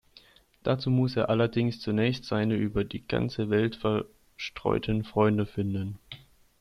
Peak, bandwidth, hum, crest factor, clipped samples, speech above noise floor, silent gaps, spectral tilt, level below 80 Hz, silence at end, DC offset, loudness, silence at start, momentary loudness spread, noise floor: -10 dBFS; 11.5 kHz; none; 18 dB; under 0.1%; 30 dB; none; -8 dB/octave; -52 dBFS; 0.45 s; under 0.1%; -28 LUFS; 0.65 s; 12 LU; -58 dBFS